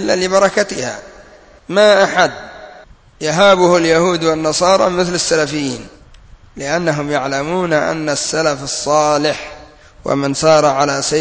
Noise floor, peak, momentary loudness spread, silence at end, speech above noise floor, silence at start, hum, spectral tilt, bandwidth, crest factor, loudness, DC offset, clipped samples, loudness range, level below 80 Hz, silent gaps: -42 dBFS; 0 dBFS; 12 LU; 0 s; 28 dB; 0 s; none; -3.5 dB/octave; 8 kHz; 14 dB; -14 LUFS; under 0.1%; under 0.1%; 4 LU; -46 dBFS; none